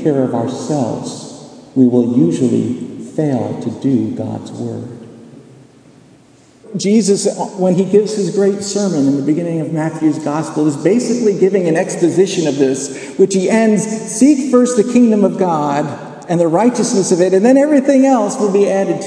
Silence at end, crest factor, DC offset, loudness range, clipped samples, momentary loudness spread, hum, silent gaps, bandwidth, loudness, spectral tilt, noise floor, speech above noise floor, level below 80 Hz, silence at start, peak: 0 s; 14 dB; under 0.1%; 7 LU; under 0.1%; 13 LU; none; none; 10.5 kHz; -14 LUFS; -6 dB/octave; -46 dBFS; 33 dB; -62 dBFS; 0 s; 0 dBFS